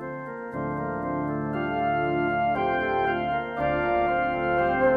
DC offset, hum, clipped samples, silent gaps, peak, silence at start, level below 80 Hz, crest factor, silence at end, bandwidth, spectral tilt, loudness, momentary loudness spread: under 0.1%; none; under 0.1%; none; -10 dBFS; 0 s; -48 dBFS; 16 dB; 0 s; 5 kHz; -8.5 dB/octave; -26 LUFS; 7 LU